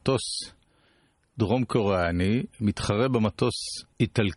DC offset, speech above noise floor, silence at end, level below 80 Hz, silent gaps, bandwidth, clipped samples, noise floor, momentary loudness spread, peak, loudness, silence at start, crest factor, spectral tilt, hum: under 0.1%; 40 dB; 0 s; -50 dBFS; none; 11.5 kHz; under 0.1%; -65 dBFS; 9 LU; -8 dBFS; -26 LUFS; 0.05 s; 18 dB; -5.5 dB/octave; none